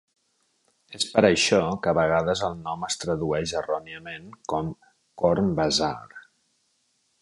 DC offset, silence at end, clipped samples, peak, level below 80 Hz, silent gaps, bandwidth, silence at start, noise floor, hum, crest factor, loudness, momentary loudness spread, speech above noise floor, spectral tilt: under 0.1%; 1 s; under 0.1%; -2 dBFS; -52 dBFS; none; 11.5 kHz; 0.9 s; -70 dBFS; none; 24 dB; -24 LUFS; 17 LU; 46 dB; -4 dB/octave